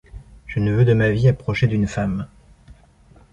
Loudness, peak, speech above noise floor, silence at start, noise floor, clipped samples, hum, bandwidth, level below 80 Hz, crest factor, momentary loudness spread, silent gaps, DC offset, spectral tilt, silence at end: -19 LUFS; -4 dBFS; 33 dB; 0.15 s; -50 dBFS; under 0.1%; none; 7.8 kHz; -40 dBFS; 16 dB; 13 LU; none; under 0.1%; -8 dB/octave; 1.05 s